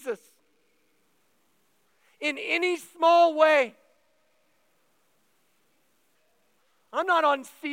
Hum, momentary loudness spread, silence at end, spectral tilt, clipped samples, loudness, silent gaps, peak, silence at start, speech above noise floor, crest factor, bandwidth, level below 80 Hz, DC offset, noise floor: none; 13 LU; 0 s; -2 dB/octave; under 0.1%; -24 LUFS; none; -8 dBFS; 0.05 s; 47 dB; 22 dB; 16 kHz; under -90 dBFS; under 0.1%; -70 dBFS